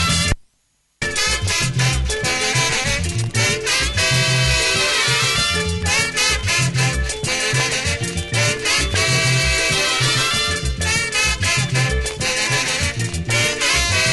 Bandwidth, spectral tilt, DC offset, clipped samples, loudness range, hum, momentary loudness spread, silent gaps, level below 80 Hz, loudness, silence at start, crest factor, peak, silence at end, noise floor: 12 kHz; -2.5 dB/octave; under 0.1%; under 0.1%; 2 LU; none; 5 LU; none; -30 dBFS; -17 LUFS; 0 s; 16 dB; -2 dBFS; 0 s; -64 dBFS